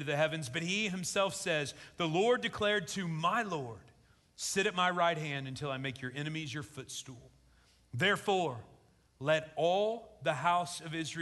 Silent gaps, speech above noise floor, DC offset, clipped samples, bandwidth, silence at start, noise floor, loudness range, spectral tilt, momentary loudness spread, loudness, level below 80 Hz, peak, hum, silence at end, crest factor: none; 32 dB; under 0.1%; under 0.1%; 12 kHz; 0 s; -66 dBFS; 4 LU; -4 dB/octave; 12 LU; -33 LUFS; -68 dBFS; -16 dBFS; none; 0 s; 18 dB